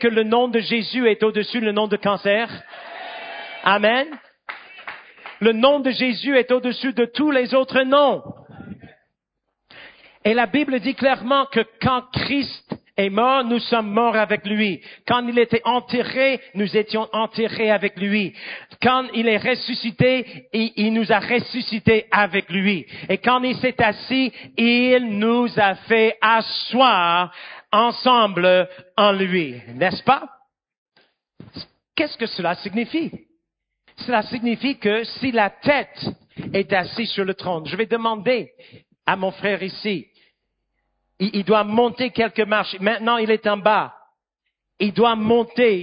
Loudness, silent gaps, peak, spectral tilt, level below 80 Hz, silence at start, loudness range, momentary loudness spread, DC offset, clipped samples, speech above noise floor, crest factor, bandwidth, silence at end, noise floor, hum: -20 LUFS; 30.78-30.86 s; 0 dBFS; -10 dB/octave; -56 dBFS; 0 s; 6 LU; 13 LU; under 0.1%; under 0.1%; 59 dB; 20 dB; 5.2 kHz; 0 s; -79 dBFS; none